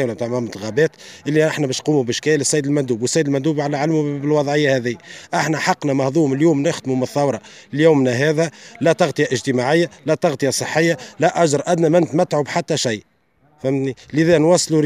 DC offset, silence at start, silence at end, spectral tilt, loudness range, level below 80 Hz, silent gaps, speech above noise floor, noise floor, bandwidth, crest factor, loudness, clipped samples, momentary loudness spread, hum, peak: under 0.1%; 0 s; 0 s; -5 dB/octave; 1 LU; -62 dBFS; none; 40 dB; -58 dBFS; 15.5 kHz; 16 dB; -18 LUFS; under 0.1%; 7 LU; none; -2 dBFS